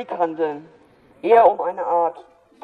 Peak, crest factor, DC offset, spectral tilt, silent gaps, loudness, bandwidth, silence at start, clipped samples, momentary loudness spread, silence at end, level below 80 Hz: -4 dBFS; 16 dB; under 0.1%; -7 dB/octave; none; -19 LUFS; 4.8 kHz; 0 s; under 0.1%; 13 LU; 0.45 s; -66 dBFS